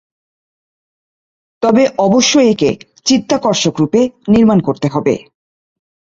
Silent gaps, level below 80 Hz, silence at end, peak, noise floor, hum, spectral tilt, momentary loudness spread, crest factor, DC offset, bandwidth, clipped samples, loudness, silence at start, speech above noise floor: none; -48 dBFS; 0.95 s; 0 dBFS; under -90 dBFS; none; -4.5 dB/octave; 7 LU; 14 dB; under 0.1%; 7.8 kHz; under 0.1%; -13 LUFS; 1.6 s; over 78 dB